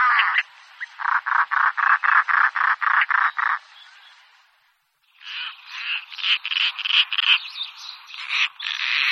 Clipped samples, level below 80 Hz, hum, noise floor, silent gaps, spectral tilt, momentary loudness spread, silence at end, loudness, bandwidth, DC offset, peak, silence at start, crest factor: under 0.1%; under -90 dBFS; none; -65 dBFS; none; 7.5 dB/octave; 15 LU; 0 s; -20 LUFS; 12.5 kHz; under 0.1%; -2 dBFS; 0 s; 20 dB